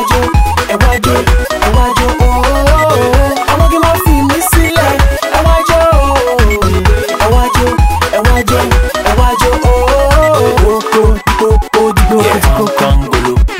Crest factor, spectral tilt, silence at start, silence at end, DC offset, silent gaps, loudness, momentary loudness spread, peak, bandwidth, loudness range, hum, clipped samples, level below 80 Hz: 8 dB; -5 dB/octave; 0 s; 0 s; under 0.1%; none; -10 LUFS; 3 LU; 0 dBFS; 16.5 kHz; 1 LU; none; 0.3%; -12 dBFS